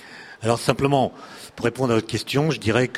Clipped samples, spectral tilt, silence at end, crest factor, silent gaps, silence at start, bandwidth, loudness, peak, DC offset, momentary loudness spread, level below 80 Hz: under 0.1%; -5.5 dB/octave; 0 s; 22 dB; none; 0 s; 15.5 kHz; -22 LUFS; -2 dBFS; under 0.1%; 14 LU; -52 dBFS